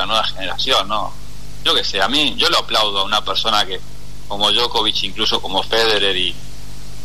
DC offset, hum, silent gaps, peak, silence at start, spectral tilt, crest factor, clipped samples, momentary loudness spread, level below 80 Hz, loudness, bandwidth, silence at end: 7%; 50 Hz at -40 dBFS; none; -2 dBFS; 0 s; -2 dB/octave; 16 dB; under 0.1%; 16 LU; -38 dBFS; -16 LUFS; 13.5 kHz; 0 s